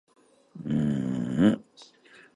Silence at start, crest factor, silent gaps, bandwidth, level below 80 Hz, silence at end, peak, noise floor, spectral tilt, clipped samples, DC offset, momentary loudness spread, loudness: 0.55 s; 18 dB; none; 11 kHz; -56 dBFS; 0.5 s; -10 dBFS; -55 dBFS; -8 dB/octave; under 0.1%; under 0.1%; 10 LU; -27 LUFS